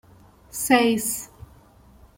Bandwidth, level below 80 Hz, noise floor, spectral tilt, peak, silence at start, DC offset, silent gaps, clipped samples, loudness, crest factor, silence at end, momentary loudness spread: 16.5 kHz; -54 dBFS; -52 dBFS; -3 dB/octave; -4 dBFS; 0.55 s; under 0.1%; none; under 0.1%; -22 LUFS; 22 dB; 0.9 s; 18 LU